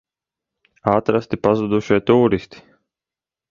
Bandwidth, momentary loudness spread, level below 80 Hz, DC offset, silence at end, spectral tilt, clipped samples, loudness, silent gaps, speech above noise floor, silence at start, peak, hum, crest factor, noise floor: 7.2 kHz; 6 LU; -50 dBFS; under 0.1%; 1.05 s; -8 dB/octave; under 0.1%; -18 LUFS; none; 72 dB; 0.85 s; 0 dBFS; none; 20 dB; -89 dBFS